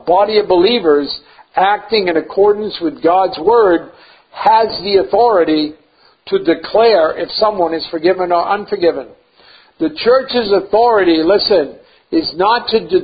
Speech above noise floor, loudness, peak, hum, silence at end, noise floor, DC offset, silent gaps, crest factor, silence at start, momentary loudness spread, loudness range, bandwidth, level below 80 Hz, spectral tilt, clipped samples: 33 dB; -13 LUFS; 0 dBFS; none; 0 s; -46 dBFS; under 0.1%; none; 14 dB; 0.05 s; 7 LU; 2 LU; 5 kHz; -50 dBFS; -8.5 dB/octave; under 0.1%